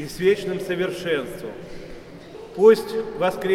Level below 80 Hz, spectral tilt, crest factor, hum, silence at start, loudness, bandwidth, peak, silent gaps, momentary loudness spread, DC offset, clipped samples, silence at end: -50 dBFS; -5.5 dB/octave; 20 dB; none; 0 s; -21 LUFS; 15 kHz; -2 dBFS; none; 24 LU; under 0.1%; under 0.1%; 0 s